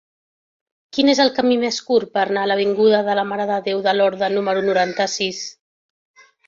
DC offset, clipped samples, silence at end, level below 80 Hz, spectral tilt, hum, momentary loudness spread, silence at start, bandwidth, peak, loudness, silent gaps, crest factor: under 0.1%; under 0.1%; 0.95 s; -64 dBFS; -4 dB/octave; none; 6 LU; 0.95 s; 7.6 kHz; -2 dBFS; -18 LUFS; none; 18 dB